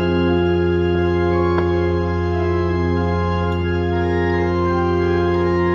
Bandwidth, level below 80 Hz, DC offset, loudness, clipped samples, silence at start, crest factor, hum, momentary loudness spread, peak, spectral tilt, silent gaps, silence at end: 6.6 kHz; -34 dBFS; under 0.1%; -18 LUFS; under 0.1%; 0 s; 12 dB; none; 3 LU; -6 dBFS; -8.5 dB/octave; none; 0 s